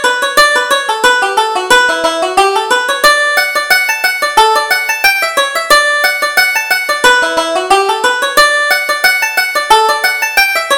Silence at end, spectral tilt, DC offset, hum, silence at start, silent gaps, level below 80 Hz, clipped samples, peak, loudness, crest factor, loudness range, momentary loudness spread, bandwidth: 0 s; 0.5 dB/octave; under 0.1%; none; 0 s; none; -44 dBFS; 0.2%; 0 dBFS; -9 LUFS; 10 dB; 1 LU; 4 LU; over 20 kHz